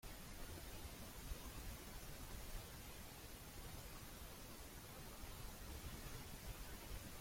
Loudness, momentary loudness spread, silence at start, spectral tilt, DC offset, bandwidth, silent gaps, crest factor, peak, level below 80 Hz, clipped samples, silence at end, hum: -54 LUFS; 2 LU; 0.05 s; -3.5 dB/octave; under 0.1%; 16.5 kHz; none; 16 dB; -38 dBFS; -56 dBFS; under 0.1%; 0 s; none